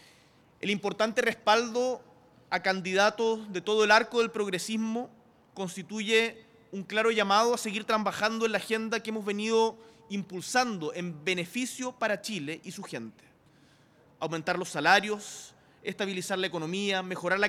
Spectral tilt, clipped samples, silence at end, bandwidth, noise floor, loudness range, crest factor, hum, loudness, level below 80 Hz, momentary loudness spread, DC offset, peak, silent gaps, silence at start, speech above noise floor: -3.5 dB/octave; under 0.1%; 0 s; 16 kHz; -61 dBFS; 5 LU; 22 dB; none; -29 LUFS; -74 dBFS; 15 LU; under 0.1%; -8 dBFS; none; 0.65 s; 32 dB